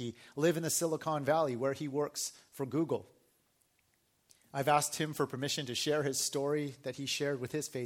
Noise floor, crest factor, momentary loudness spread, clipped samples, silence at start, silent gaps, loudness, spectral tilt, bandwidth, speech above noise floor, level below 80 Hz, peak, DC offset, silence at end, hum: -74 dBFS; 20 dB; 9 LU; under 0.1%; 0 s; none; -34 LUFS; -4 dB/octave; 17 kHz; 40 dB; -76 dBFS; -14 dBFS; under 0.1%; 0 s; none